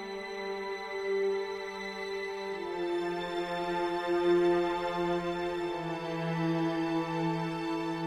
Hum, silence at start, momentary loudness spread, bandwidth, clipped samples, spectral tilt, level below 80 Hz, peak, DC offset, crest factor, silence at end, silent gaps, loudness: none; 0 s; 9 LU; 11 kHz; under 0.1%; -6.5 dB/octave; -62 dBFS; -16 dBFS; under 0.1%; 16 dB; 0 s; none; -32 LUFS